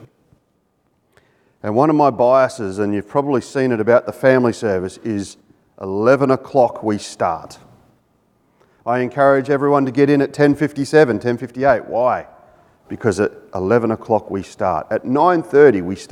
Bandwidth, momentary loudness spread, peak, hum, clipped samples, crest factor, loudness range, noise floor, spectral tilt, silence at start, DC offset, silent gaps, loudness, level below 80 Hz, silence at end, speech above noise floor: 12 kHz; 10 LU; 0 dBFS; none; under 0.1%; 18 dB; 4 LU; -64 dBFS; -7 dB/octave; 1.65 s; under 0.1%; none; -17 LUFS; -56 dBFS; 0.05 s; 48 dB